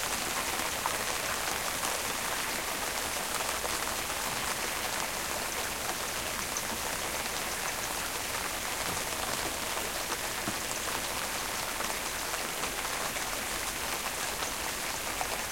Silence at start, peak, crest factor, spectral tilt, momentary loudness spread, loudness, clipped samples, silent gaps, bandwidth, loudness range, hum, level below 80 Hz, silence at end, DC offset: 0 s; -12 dBFS; 20 dB; -1 dB/octave; 2 LU; -32 LUFS; under 0.1%; none; 16.5 kHz; 1 LU; none; -52 dBFS; 0 s; under 0.1%